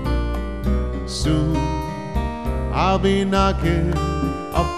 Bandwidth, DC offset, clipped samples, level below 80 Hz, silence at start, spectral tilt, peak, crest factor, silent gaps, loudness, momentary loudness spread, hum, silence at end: 13.5 kHz; 0.9%; under 0.1%; -26 dBFS; 0 s; -6.5 dB/octave; -4 dBFS; 16 dB; none; -21 LUFS; 8 LU; none; 0 s